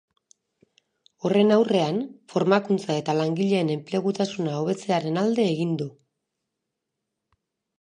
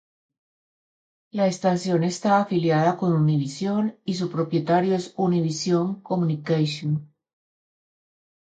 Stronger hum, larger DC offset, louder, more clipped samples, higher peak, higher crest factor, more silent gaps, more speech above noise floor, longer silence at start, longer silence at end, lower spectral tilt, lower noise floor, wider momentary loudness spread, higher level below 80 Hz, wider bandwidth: neither; neither; about the same, -24 LUFS vs -23 LUFS; neither; first, -4 dBFS vs -8 dBFS; about the same, 20 dB vs 16 dB; neither; second, 60 dB vs over 68 dB; about the same, 1.25 s vs 1.35 s; first, 1.9 s vs 1.55 s; about the same, -6.5 dB/octave vs -6.5 dB/octave; second, -83 dBFS vs under -90 dBFS; about the same, 8 LU vs 6 LU; second, -74 dBFS vs -68 dBFS; first, 10 kHz vs 9 kHz